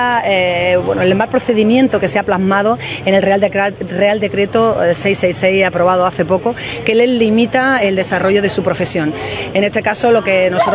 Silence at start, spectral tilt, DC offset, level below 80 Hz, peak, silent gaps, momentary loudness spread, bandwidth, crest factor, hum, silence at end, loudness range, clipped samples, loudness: 0 s; -9.5 dB/octave; under 0.1%; -44 dBFS; 0 dBFS; none; 5 LU; 4 kHz; 14 dB; none; 0 s; 1 LU; under 0.1%; -13 LUFS